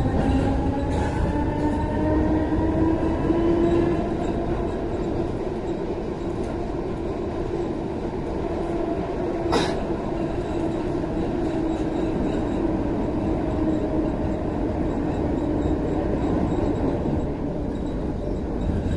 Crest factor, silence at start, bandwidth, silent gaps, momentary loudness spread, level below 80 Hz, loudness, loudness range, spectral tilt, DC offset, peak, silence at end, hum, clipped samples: 16 dB; 0 s; 11.5 kHz; none; 6 LU; -32 dBFS; -25 LUFS; 5 LU; -8 dB/octave; under 0.1%; -8 dBFS; 0 s; none; under 0.1%